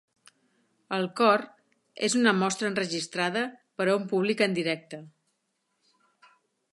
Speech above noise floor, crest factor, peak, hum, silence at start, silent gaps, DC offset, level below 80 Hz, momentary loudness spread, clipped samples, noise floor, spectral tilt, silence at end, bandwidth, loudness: 51 dB; 22 dB; -6 dBFS; none; 0.9 s; none; under 0.1%; -80 dBFS; 12 LU; under 0.1%; -77 dBFS; -4 dB/octave; 1.65 s; 11.5 kHz; -27 LUFS